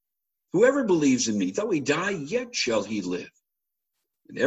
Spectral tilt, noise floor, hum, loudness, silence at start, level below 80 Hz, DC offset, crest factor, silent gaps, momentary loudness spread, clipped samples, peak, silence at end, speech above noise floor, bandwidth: -4 dB/octave; -85 dBFS; none; -25 LUFS; 0.55 s; -66 dBFS; under 0.1%; 18 dB; none; 9 LU; under 0.1%; -8 dBFS; 0 s; 61 dB; 8.6 kHz